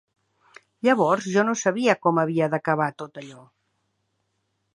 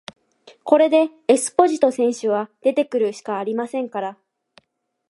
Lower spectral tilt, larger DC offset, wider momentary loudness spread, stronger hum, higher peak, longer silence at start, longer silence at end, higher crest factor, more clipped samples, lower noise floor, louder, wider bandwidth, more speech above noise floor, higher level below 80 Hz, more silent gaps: first, -5.5 dB/octave vs -4 dB/octave; neither; first, 17 LU vs 11 LU; neither; about the same, -2 dBFS vs 0 dBFS; first, 0.85 s vs 0.65 s; first, 1.35 s vs 1 s; about the same, 22 dB vs 20 dB; neither; first, -74 dBFS vs -63 dBFS; about the same, -22 LUFS vs -20 LUFS; about the same, 11 kHz vs 11.5 kHz; first, 52 dB vs 44 dB; about the same, -76 dBFS vs -72 dBFS; neither